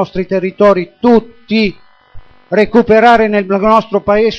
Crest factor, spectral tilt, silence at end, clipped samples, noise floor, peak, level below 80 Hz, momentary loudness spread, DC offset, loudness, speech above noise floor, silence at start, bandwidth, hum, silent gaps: 12 dB; -7 dB/octave; 0 s; 0.2%; -33 dBFS; 0 dBFS; -38 dBFS; 9 LU; under 0.1%; -11 LUFS; 23 dB; 0 s; 7.4 kHz; none; none